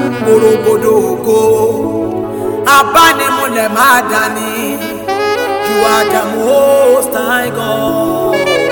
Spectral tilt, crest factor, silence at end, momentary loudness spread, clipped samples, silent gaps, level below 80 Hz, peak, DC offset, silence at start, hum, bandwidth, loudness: -3.5 dB/octave; 10 dB; 0 s; 9 LU; 0.4%; none; -44 dBFS; 0 dBFS; under 0.1%; 0 s; none; over 20 kHz; -11 LUFS